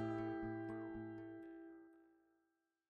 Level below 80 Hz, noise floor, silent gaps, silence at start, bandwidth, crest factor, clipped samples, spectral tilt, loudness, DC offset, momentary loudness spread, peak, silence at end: -72 dBFS; -87 dBFS; none; 0 s; 5.2 kHz; 16 dB; under 0.1%; -9 dB/octave; -48 LUFS; under 0.1%; 16 LU; -34 dBFS; 0.8 s